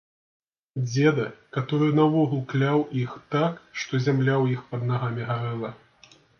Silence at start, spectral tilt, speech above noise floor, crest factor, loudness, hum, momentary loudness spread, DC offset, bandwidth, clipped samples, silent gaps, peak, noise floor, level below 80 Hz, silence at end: 0.75 s; -7 dB/octave; 31 dB; 18 dB; -25 LUFS; none; 11 LU; under 0.1%; 6.8 kHz; under 0.1%; none; -8 dBFS; -56 dBFS; -66 dBFS; 0.65 s